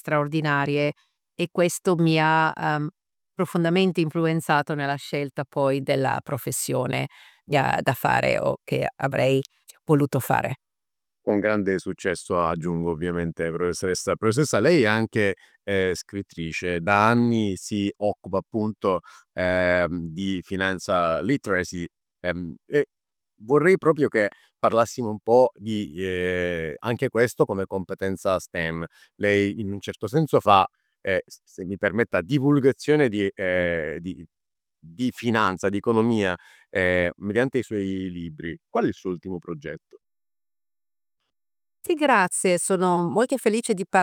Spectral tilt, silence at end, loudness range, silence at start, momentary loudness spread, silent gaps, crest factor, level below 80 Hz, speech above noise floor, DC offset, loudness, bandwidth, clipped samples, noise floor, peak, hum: -5.5 dB/octave; 0 s; 4 LU; 0.05 s; 12 LU; none; 20 dB; -60 dBFS; over 67 dB; under 0.1%; -24 LUFS; 19.5 kHz; under 0.1%; under -90 dBFS; -4 dBFS; none